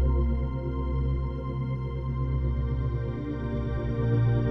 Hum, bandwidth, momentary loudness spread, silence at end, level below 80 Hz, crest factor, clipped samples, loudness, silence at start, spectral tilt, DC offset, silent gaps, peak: none; 4.4 kHz; 7 LU; 0 s; -30 dBFS; 12 dB; under 0.1%; -29 LUFS; 0 s; -10.5 dB/octave; under 0.1%; none; -14 dBFS